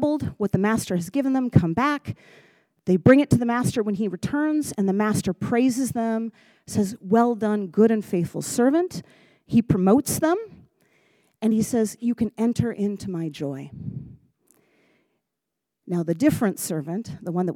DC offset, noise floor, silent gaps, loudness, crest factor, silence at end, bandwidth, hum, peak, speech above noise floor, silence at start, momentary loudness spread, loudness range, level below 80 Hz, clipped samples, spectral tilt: under 0.1%; -83 dBFS; none; -23 LUFS; 22 dB; 0 s; 17 kHz; none; -2 dBFS; 61 dB; 0 s; 11 LU; 7 LU; -54 dBFS; under 0.1%; -6.5 dB/octave